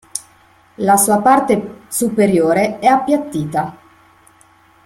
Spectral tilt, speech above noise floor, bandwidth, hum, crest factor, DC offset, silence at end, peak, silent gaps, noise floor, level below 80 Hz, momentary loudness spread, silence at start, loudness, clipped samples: -5 dB/octave; 36 dB; 16.5 kHz; none; 16 dB; under 0.1%; 1.1 s; 0 dBFS; none; -50 dBFS; -54 dBFS; 11 LU; 0.15 s; -15 LUFS; under 0.1%